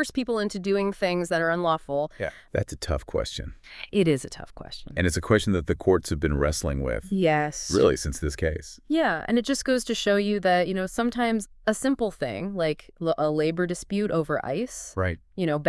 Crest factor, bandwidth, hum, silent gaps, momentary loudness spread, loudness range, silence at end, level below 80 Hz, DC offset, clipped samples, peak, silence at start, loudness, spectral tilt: 20 dB; 12 kHz; none; none; 8 LU; 3 LU; 0 s; -42 dBFS; under 0.1%; under 0.1%; -6 dBFS; 0 s; -26 LUFS; -5 dB/octave